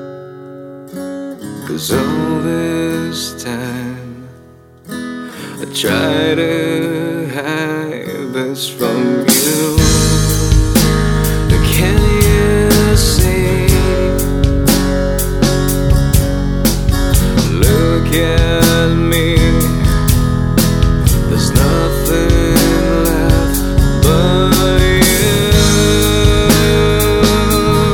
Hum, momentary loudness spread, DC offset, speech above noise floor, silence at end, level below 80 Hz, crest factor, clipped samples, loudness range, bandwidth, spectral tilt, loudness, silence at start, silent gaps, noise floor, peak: none; 12 LU; under 0.1%; 25 dB; 0 s; -18 dBFS; 12 dB; under 0.1%; 8 LU; over 20 kHz; -5 dB/octave; -13 LUFS; 0 s; none; -40 dBFS; 0 dBFS